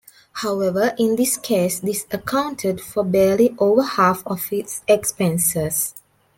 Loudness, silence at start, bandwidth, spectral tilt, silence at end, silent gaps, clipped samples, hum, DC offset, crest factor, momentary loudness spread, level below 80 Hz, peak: -20 LUFS; 0.35 s; 17 kHz; -4.5 dB/octave; 0.4 s; none; under 0.1%; none; under 0.1%; 16 dB; 8 LU; -56 dBFS; -4 dBFS